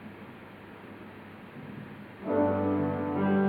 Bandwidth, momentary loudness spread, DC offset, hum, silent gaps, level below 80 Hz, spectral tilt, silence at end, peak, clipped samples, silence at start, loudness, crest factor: 4.7 kHz; 19 LU; under 0.1%; none; none; -68 dBFS; -10 dB/octave; 0 s; -14 dBFS; under 0.1%; 0 s; -29 LUFS; 16 dB